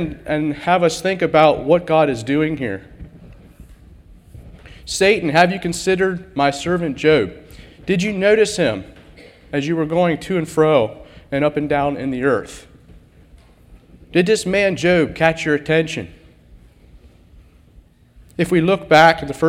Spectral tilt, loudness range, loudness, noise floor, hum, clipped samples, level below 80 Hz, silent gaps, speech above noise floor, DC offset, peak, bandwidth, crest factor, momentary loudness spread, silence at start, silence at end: -5.5 dB/octave; 5 LU; -17 LUFS; -49 dBFS; none; under 0.1%; -44 dBFS; none; 32 dB; under 0.1%; 0 dBFS; 15.5 kHz; 18 dB; 11 LU; 0 s; 0 s